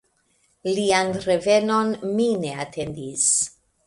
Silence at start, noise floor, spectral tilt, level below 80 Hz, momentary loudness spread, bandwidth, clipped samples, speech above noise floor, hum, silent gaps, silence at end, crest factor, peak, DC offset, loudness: 0.65 s; -65 dBFS; -3 dB/octave; -58 dBFS; 11 LU; 11.5 kHz; under 0.1%; 44 dB; none; none; 0.35 s; 16 dB; -6 dBFS; under 0.1%; -22 LUFS